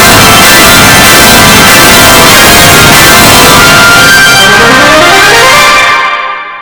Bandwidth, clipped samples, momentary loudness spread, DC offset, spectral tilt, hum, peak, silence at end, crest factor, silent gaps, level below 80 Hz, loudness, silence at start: over 20 kHz; 70%; 2 LU; under 0.1%; -2 dB/octave; none; 0 dBFS; 0 s; 2 dB; none; -22 dBFS; 1 LUFS; 0 s